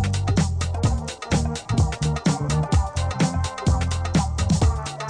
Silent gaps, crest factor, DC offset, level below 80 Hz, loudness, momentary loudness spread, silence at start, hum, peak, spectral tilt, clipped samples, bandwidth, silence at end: none; 14 dB; under 0.1%; -28 dBFS; -23 LUFS; 3 LU; 0 s; none; -8 dBFS; -5.5 dB/octave; under 0.1%; 10 kHz; 0 s